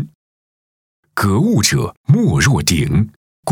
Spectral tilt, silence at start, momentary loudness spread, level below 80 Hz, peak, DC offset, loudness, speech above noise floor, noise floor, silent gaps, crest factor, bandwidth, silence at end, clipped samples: -5 dB/octave; 0 s; 13 LU; -36 dBFS; -2 dBFS; under 0.1%; -15 LUFS; over 76 dB; under -90 dBFS; 0.15-1.03 s, 1.97-2.04 s, 3.16-3.43 s; 14 dB; 18 kHz; 0 s; under 0.1%